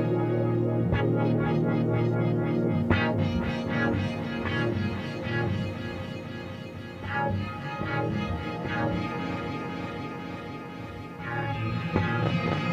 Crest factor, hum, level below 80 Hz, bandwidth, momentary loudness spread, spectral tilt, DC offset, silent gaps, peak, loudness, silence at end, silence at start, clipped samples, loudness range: 20 dB; none; -48 dBFS; 8 kHz; 12 LU; -8 dB/octave; under 0.1%; none; -8 dBFS; -29 LUFS; 0 s; 0 s; under 0.1%; 7 LU